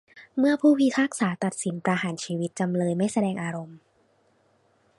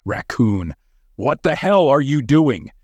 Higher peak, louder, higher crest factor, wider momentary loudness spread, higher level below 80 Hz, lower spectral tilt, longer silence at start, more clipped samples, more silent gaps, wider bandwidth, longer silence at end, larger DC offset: second, -8 dBFS vs -2 dBFS; second, -25 LUFS vs -17 LUFS; about the same, 18 dB vs 16 dB; about the same, 12 LU vs 10 LU; second, -70 dBFS vs -46 dBFS; second, -5.5 dB/octave vs -7.5 dB/octave; about the same, 0.15 s vs 0.05 s; neither; neither; about the same, 11.5 kHz vs 10.5 kHz; first, 1.2 s vs 0.15 s; neither